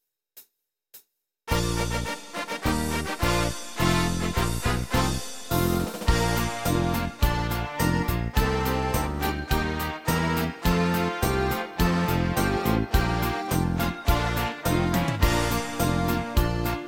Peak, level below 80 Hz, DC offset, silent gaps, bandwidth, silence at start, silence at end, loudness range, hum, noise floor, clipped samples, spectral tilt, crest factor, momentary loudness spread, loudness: -8 dBFS; -32 dBFS; under 0.1%; none; 17 kHz; 0 s; 0 s; 2 LU; none; -72 dBFS; under 0.1%; -5 dB/octave; 18 dB; 5 LU; -26 LUFS